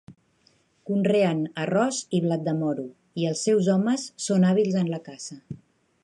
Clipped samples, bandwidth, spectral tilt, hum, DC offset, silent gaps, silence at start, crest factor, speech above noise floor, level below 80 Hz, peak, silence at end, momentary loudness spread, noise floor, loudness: under 0.1%; 11.5 kHz; -6 dB/octave; none; under 0.1%; none; 0.1 s; 16 dB; 40 dB; -70 dBFS; -10 dBFS; 0.45 s; 17 LU; -64 dBFS; -24 LUFS